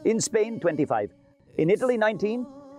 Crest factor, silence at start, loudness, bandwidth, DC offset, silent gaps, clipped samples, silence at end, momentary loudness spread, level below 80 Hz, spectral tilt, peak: 14 dB; 0 s; -25 LUFS; 14.5 kHz; under 0.1%; none; under 0.1%; 0 s; 10 LU; -68 dBFS; -5 dB/octave; -12 dBFS